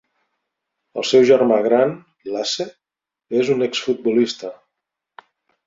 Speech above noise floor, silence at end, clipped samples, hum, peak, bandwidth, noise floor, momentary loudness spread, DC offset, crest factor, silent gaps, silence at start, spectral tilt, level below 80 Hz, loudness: 70 dB; 1.15 s; under 0.1%; none; -2 dBFS; 7.8 kHz; -87 dBFS; 17 LU; under 0.1%; 18 dB; none; 0.95 s; -4.5 dB/octave; -66 dBFS; -18 LUFS